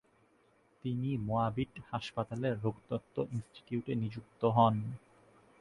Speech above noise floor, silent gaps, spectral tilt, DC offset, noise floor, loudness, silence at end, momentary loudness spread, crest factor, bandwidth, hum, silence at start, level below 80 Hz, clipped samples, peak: 35 dB; none; -8.5 dB/octave; under 0.1%; -69 dBFS; -35 LUFS; 0.65 s; 12 LU; 22 dB; 11 kHz; none; 0.85 s; -64 dBFS; under 0.1%; -14 dBFS